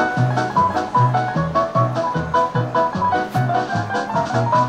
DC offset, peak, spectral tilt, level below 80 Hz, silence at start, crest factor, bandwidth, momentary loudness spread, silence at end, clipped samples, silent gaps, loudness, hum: under 0.1%; -6 dBFS; -7 dB/octave; -46 dBFS; 0 s; 12 dB; 9.6 kHz; 3 LU; 0 s; under 0.1%; none; -19 LUFS; none